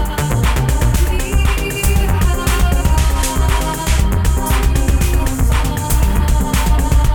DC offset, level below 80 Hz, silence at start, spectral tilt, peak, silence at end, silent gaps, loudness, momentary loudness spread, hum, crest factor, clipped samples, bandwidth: under 0.1%; -14 dBFS; 0 s; -5 dB/octave; -2 dBFS; 0 s; none; -16 LUFS; 2 LU; none; 12 dB; under 0.1%; over 20 kHz